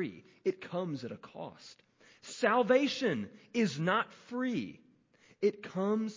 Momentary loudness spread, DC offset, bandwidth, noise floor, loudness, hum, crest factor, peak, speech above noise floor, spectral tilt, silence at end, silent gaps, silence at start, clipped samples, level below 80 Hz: 18 LU; under 0.1%; 7.6 kHz; -65 dBFS; -33 LUFS; none; 20 dB; -14 dBFS; 32 dB; -5.5 dB/octave; 0 s; none; 0 s; under 0.1%; -76 dBFS